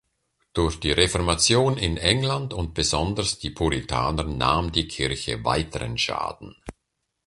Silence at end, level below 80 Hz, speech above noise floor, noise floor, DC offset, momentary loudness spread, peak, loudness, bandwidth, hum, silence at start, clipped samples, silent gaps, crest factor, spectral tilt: 0.55 s; -36 dBFS; 54 dB; -78 dBFS; under 0.1%; 9 LU; -4 dBFS; -23 LUFS; 11.5 kHz; none; 0.55 s; under 0.1%; none; 22 dB; -4 dB/octave